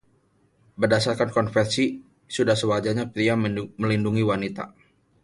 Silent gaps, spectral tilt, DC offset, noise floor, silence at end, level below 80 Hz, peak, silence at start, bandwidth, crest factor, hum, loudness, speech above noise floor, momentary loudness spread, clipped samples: none; -5.5 dB/octave; under 0.1%; -64 dBFS; 0.55 s; -56 dBFS; -6 dBFS; 0.8 s; 11.5 kHz; 18 dB; none; -24 LUFS; 41 dB; 10 LU; under 0.1%